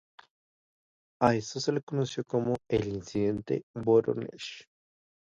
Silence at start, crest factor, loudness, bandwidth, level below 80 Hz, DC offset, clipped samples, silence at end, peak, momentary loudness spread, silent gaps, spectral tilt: 1.2 s; 24 dB; -30 LUFS; 7.8 kHz; -60 dBFS; under 0.1%; under 0.1%; 0.7 s; -8 dBFS; 11 LU; 1.83-1.87 s, 3.63-3.74 s; -6 dB/octave